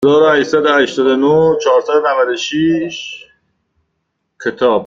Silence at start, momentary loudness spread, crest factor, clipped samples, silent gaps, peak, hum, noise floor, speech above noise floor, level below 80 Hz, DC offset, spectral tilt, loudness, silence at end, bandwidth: 0 s; 12 LU; 12 dB; under 0.1%; none; -2 dBFS; none; -70 dBFS; 57 dB; -54 dBFS; under 0.1%; -5 dB/octave; -13 LUFS; 0 s; 7.6 kHz